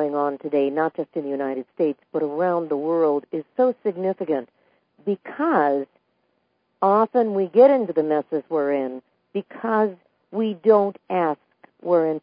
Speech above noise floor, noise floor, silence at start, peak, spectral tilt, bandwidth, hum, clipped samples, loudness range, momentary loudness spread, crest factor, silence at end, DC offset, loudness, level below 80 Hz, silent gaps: 49 dB; -70 dBFS; 0 s; -4 dBFS; -11.5 dB/octave; 5.2 kHz; none; under 0.1%; 4 LU; 11 LU; 18 dB; 0.05 s; under 0.1%; -22 LUFS; -80 dBFS; none